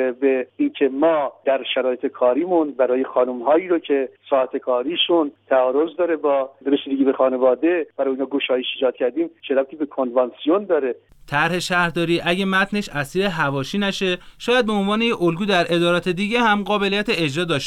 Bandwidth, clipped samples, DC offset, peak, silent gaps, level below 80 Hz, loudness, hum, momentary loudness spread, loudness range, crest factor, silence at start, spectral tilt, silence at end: 14 kHz; under 0.1%; under 0.1%; -6 dBFS; none; -52 dBFS; -20 LUFS; none; 5 LU; 2 LU; 14 dB; 0 s; -5.5 dB/octave; 0 s